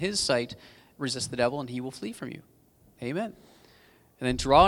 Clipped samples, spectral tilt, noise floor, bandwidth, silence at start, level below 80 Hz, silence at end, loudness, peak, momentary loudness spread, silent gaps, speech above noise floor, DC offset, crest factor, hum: under 0.1%; -4 dB/octave; -60 dBFS; 19.5 kHz; 0 s; -48 dBFS; 0 s; -30 LUFS; -6 dBFS; 14 LU; none; 33 dB; under 0.1%; 24 dB; none